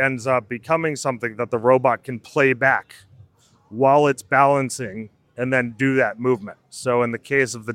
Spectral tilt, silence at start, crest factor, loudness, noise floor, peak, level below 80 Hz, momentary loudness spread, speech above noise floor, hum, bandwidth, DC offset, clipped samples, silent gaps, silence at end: -5.5 dB/octave; 0 s; 18 dB; -20 LUFS; -54 dBFS; -2 dBFS; -64 dBFS; 12 LU; 34 dB; none; 15.5 kHz; under 0.1%; under 0.1%; none; 0 s